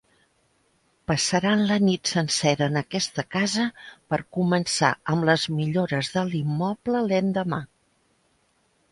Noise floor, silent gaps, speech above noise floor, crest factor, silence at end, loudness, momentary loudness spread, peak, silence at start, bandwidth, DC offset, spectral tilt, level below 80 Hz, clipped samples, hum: -67 dBFS; none; 43 dB; 22 dB; 1.25 s; -24 LUFS; 7 LU; -4 dBFS; 1.1 s; 11.5 kHz; under 0.1%; -4.5 dB/octave; -60 dBFS; under 0.1%; none